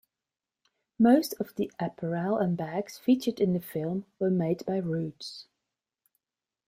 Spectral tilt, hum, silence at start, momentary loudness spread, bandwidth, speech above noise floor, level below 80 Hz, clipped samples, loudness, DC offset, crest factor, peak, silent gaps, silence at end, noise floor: -7 dB/octave; none; 1 s; 11 LU; 16 kHz; over 62 dB; -70 dBFS; under 0.1%; -29 LUFS; under 0.1%; 20 dB; -10 dBFS; none; 1.25 s; under -90 dBFS